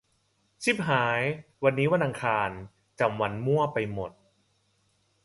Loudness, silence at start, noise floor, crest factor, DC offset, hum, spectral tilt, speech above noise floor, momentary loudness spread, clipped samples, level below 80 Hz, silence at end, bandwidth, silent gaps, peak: -27 LUFS; 0.6 s; -71 dBFS; 20 dB; under 0.1%; none; -6 dB/octave; 44 dB; 9 LU; under 0.1%; -60 dBFS; 1.15 s; 11.5 kHz; none; -10 dBFS